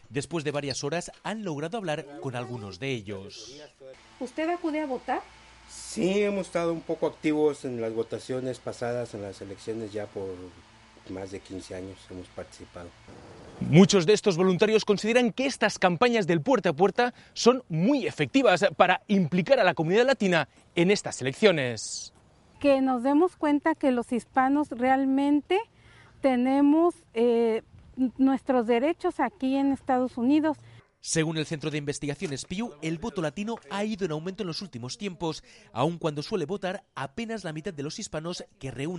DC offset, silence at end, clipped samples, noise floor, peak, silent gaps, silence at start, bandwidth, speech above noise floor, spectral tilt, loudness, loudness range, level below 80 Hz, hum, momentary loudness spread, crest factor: under 0.1%; 0 s; under 0.1%; -55 dBFS; -4 dBFS; none; 0.1 s; 11.5 kHz; 28 dB; -5.5 dB/octave; -26 LUFS; 11 LU; -60 dBFS; none; 16 LU; 24 dB